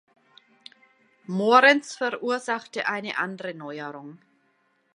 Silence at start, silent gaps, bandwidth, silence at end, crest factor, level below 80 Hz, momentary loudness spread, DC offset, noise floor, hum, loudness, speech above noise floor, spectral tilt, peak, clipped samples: 1.3 s; none; 11 kHz; 0.8 s; 24 dB; -84 dBFS; 19 LU; under 0.1%; -68 dBFS; none; -23 LUFS; 44 dB; -4 dB/octave; -2 dBFS; under 0.1%